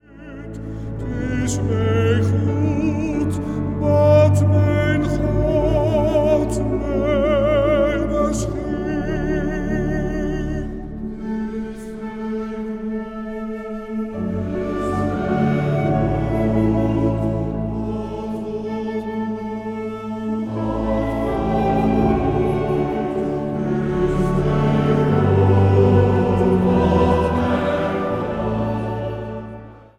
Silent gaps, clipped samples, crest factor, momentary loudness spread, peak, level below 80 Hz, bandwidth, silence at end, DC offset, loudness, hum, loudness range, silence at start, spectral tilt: none; under 0.1%; 16 dB; 12 LU; -2 dBFS; -32 dBFS; 11.5 kHz; 0.2 s; under 0.1%; -20 LUFS; none; 9 LU; 0.1 s; -8 dB/octave